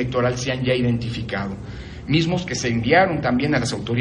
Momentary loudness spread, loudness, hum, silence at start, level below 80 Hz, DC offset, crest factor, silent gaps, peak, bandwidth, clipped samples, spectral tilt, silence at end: 12 LU; -21 LUFS; none; 0 s; -42 dBFS; under 0.1%; 18 dB; none; -4 dBFS; 10.5 kHz; under 0.1%; -5.5 dB/octave; 0 s